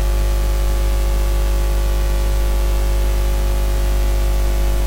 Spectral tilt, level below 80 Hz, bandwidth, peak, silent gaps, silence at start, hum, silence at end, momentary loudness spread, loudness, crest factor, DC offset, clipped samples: -5.5 dB/octave; -16 dBFS; 16 kHz; -8 dBFS; none; 0 s; 50 Hz at -15 dBFS; 0 s; 0 LU; -20 LUFS; 8 dB; under 0.1%; under 0.1%